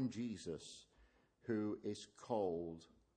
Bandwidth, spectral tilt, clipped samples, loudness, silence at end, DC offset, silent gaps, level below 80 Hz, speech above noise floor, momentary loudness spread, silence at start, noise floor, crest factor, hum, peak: 10 kHz; -6 dB/octave; under 0.1%; -45 LUFS; 0.3 s; under 0.1%; none; -76 dBFS; 28 dB; 15 LU; 0 s; -72 dBFS; 18 dB; none; -26 dBFS